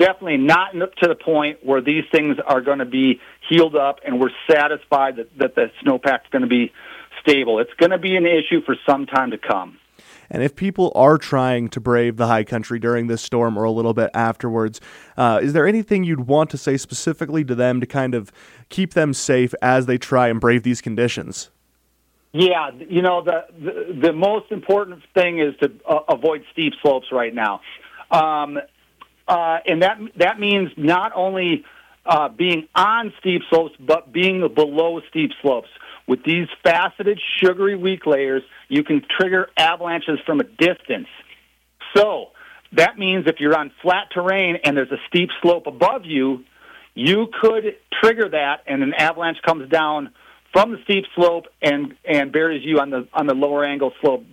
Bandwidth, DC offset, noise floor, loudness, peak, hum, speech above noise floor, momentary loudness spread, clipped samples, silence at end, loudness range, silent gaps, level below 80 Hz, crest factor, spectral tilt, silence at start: 16 kHz; under 0.1%; -63 dBFS; -19 LUFS; 0 dBFS; none; 45 dB; 7 LU; under 0.1%; 0.1 s; 2 LU; none; -58 dBFS; 18 dB; -5.5 dB/octave; 0 s